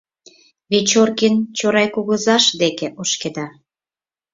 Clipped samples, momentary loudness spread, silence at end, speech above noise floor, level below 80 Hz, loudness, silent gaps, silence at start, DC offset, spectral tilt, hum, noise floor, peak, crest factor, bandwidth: under 0.1%; 10 LU; 0.85 s; over 73 dB; -62 dBFS; -17 LUFS; none; 0.7 s; under 0.1%; -3 dB/octave; none; under -90 dBFS; -2 dBFS; 16 dB; 7.8 kHz